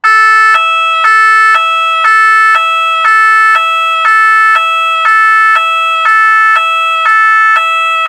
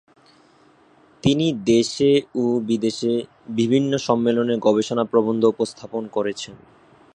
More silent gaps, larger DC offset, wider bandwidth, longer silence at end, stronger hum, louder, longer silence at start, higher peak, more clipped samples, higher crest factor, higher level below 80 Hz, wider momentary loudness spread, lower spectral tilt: neither; neither; first, 15 kHz vs 10 kHz; second, 0 s vs 0.6 s; neither; first, -6 LUFS vs -21 LUFS; second, 0.05 s vs 1.25 s; about the same, 0 dBFS vs -2 dBFS; first, 2% vs under 0.1%; second, 8 dB vs 18 dB; second, -64 dBFS vs -58 dBFS; second, 4 LU vs 9 LU; second, 3 dB/octave vs -6 dB/octave